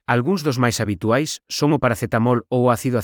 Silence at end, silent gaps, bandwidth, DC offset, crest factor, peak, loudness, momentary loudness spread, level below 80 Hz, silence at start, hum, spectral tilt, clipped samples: 0 s; none; 19.5 kHz; under 0.1%; 16 dB; -2 dBFS; -20 LUFS; 3 LU; -52 dBFS; 0.1 s; none; -5.5 dB/octave; under 0.1%